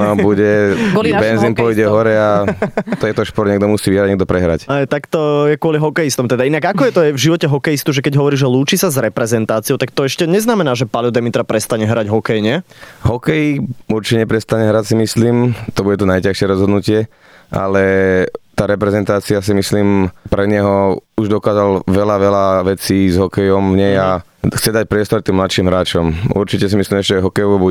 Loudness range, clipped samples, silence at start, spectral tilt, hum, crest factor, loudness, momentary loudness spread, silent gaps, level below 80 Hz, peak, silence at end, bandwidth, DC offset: 2 LU; under 0.1%; 0 s; -6 dB/octave; none; 12 dB; -14 LUFS; 5 LU; none; -40 dBFS; -2 dBFS; 0 s; 18.5 kHz; under 0.1%